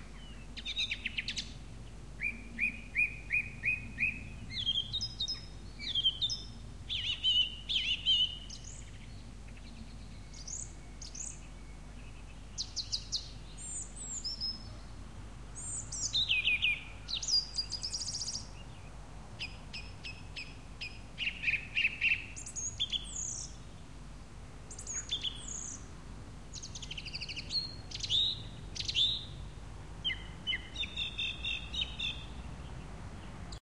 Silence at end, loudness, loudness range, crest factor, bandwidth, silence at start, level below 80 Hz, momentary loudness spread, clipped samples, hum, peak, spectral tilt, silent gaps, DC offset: 0.05 s; -34 LUFS; 9 LU; 20 dB; 12.5 kHz; 0 s; -50 dBFS; 21 LU; under 0.1%; none; -18 dBFS; -1 dB/octave; none; 0.2%